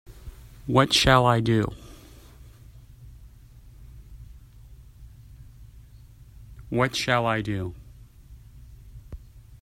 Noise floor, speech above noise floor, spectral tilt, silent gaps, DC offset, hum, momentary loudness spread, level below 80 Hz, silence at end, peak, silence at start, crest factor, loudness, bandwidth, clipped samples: -49 dBFS; 27 dB; -5 dB/octave; none; under 0.1%; none; 29 LU; -44 dBFS; 0.2 s; -2 dBFS; 0.1 s; 26 dB; -22 LUFS; 16 kHz; under 0.1%